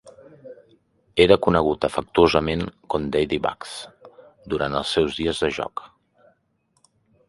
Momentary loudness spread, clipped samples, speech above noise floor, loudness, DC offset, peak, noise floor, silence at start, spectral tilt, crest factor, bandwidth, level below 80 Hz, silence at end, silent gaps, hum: 16 LU; under 0.1%; 47 dB; -22 LUFS; under 0.1%; 0 dBFS; -68 dBFS; 0.05 s; -5.5 dB/octave; 24 dB; 11.5 kHz; -44 dBFS; 1.45 s; none; none